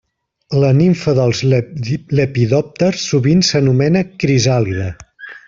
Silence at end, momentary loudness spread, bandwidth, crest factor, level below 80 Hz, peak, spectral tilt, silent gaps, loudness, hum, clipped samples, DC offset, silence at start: 0.1 s; 10 LU; 7.6 kHz; 14 dB; -46 dBFS; -2 dBFS; -6 dB/octave; none; -15 LUFS; none; under 0.1%; under 0.1%; 0.5 s